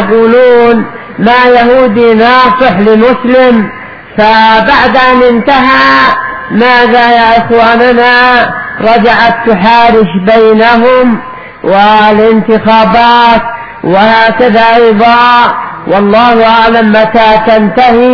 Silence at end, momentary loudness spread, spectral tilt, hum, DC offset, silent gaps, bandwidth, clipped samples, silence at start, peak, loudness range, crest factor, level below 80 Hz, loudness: 0 s; 7 LU; -7 dB/octave; none; under 0.1%; none; 5.4 kHz; 7%; 0 s; 0 dBFS; 1 LU; 4 dB; -32 dBFS; -4 LUFS